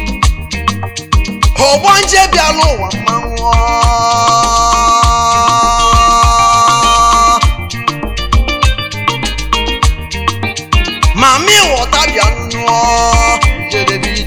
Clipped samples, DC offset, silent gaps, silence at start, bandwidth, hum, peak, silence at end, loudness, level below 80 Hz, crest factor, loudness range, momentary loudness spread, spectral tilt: 0.5%; under 0.1%; none; 0 s; 19 kHz; none; 0 dBFS; 0 s; -10 LUFS; -18 dBFS; 10 dB; 5 LU; 8 LU; -3 dB/octave